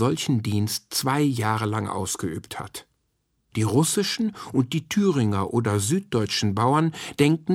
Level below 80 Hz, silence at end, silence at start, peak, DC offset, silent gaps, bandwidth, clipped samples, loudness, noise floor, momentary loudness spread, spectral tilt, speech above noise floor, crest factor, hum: -58 dBFS; 0 s; 0 s; -6 dBFS; under 0.1%; none; 16.5 kHz; under 0.1%; -24 LUFS; -72 dBFS; 9 LU; -5 dB/octave; 49 dB; 18 dB; none